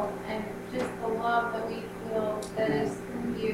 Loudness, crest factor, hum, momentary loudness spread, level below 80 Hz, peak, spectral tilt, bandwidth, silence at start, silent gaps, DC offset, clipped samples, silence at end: -31 LUFS; 16 dB; none; 8 LU; -56 dBFS; -16 dBFS; -6 dB/octave; 16 kHz; 0 s; none; under 0.1%; under 0.1%; 0 s